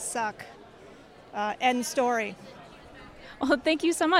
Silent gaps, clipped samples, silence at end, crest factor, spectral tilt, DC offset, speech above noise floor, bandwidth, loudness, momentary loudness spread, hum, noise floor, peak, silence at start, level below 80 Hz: none; under 0.1%; 0 s; 20 dB; -2.5 dB/octave; under 0.1%; 24 dB; 16 kHz; -28 LUFS; 23 LU; none; -50 dBFS; -8 dBFS; 0 s; -62 dBFS